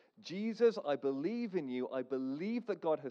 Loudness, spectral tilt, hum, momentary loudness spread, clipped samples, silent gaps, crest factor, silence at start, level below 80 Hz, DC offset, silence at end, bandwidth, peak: -37 LUFS; -7 dB/octave; none; 7 LU; under 0.1%; none; 16 dB; 0.2 s; under -90 dBFS; under 0.1%; 0 s; 7.2 kHz; -20 dBFS